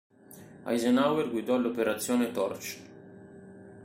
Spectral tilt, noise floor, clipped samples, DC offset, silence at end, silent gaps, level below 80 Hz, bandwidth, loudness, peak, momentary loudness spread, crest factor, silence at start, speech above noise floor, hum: -4.5 dB/octave; -51 dBFS; under 0.1%; under 0.1%; 0 s; none; -72 dBFS; 16 kHz; -29 LUFS; -12 dBFS; 25 LU; 18 dB; 0.3 s; 23 dB; none